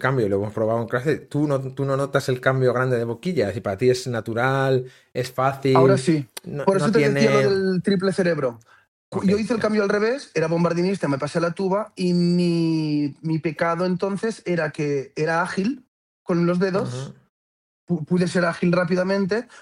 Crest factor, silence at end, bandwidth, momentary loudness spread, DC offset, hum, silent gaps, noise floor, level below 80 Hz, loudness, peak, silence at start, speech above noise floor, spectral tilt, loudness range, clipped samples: 20 dB; 0 s; 14 kHz; 7 LU; under 0.1%; none; 8.88-9.12 s, 15.88-16.26 s, 17.29-17.87 s; under -90 dBFS; -60 dBFS; -22 LUFS; -2 dBFS; 0 s; over 69 dB; -6.5 dB/octave; 5 LU; under 0.1%